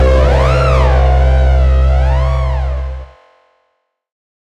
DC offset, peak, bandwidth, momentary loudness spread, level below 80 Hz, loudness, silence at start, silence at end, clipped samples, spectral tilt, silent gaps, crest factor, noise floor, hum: under 0.1%; -2 dBFS; 7.2 kHz; 9 LU; -12 dBFS; -12 LUFS; 0 s; 1.35 s; under 0.1%; -7.5 dB/octave; none; 10 dB; -65 dBFS; none